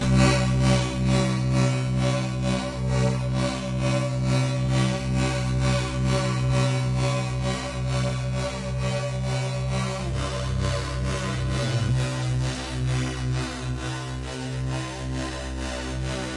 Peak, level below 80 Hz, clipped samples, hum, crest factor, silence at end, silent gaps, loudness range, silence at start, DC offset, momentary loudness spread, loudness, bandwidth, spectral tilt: -6 dBFS; -34 dBFS; under 0.1%; none; 18 dB; 0 s; none; 4 LU; 0 s; under 0.1%; 8 LU; -25 LUFS; 11.5 kHz; -5.5 dB/octave